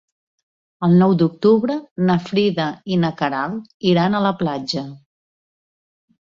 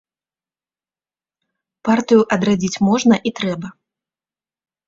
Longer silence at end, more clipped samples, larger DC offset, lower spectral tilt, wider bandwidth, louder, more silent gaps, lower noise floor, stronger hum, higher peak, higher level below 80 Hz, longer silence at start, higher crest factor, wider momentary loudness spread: first, 1.35 s vs 1.15 s; neither; neither; first, -7.5 dB/octave vs -5.5 dB/octave; about the same, 7.4 kHz vs 7.8 kHz; about the same, -19 LUFS vs -17 LUFS; first, 1.91-1.96 s, 3.74-3.80 s vs none; about the same, under -90 dBFS vs under -90 dBFS; neither; about the same, -4 dBFS vs -2 dBFS; about the same, -58 dBFS vs -56 dBFS; second, 0.8 s vs 1.85 s; about the same, 16 dB vs 18 dB; about the same, 10 LU vs 12 LU